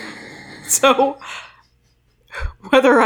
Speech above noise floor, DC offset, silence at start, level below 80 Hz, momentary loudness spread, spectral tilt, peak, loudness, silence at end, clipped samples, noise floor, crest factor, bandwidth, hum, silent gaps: 44 dB; under 0.1%; 0 s; -38 dBFS; 21 LU; -2.5 dB/octave; -2 dBFS; -15 LUFS; 0 s; under 0.1%; -59 dBFS; 16 dB; over 20 kHz; none; none